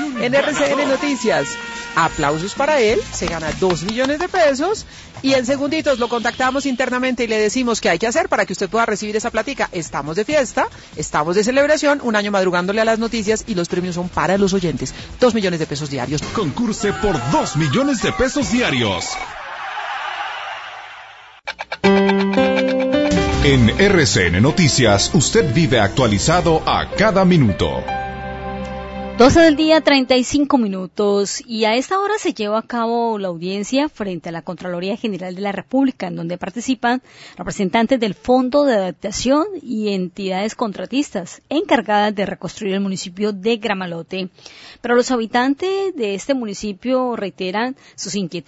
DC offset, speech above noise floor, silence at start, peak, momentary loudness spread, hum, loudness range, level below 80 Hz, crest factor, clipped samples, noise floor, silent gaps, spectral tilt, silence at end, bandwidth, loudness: under 0.1%; 23 dB; 0 s; -2 dBFS; 12 LU; none; 7 LU; -38 dBFS; 16 dB; under 0.1%; -40 dBFS; none; -4.5 dB/octave; 0.05 s; 8 kHz; -18 LUFS